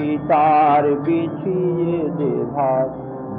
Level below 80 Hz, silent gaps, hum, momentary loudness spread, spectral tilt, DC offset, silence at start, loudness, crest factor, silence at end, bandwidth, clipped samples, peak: -54 dBFS; none; none; 8 LU; -11.5 dB/octave; under 0.1%; 0 s; -18 LUFS; 12 dB; 0 s; 4.6 kHz; under 0.1%; -6 dBFS